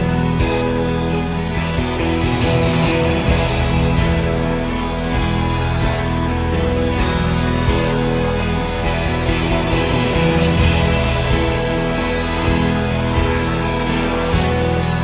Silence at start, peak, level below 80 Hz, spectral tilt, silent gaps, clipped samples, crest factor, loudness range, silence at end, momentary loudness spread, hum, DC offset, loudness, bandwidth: 0 s; -2 dBFS; -24 dBFS; -11 dB/octave; none; under 0.1%; 14 dB; 2 LU; 0 s; 4 LU; none; under 0.1%; -18 LUFS; 4 kHz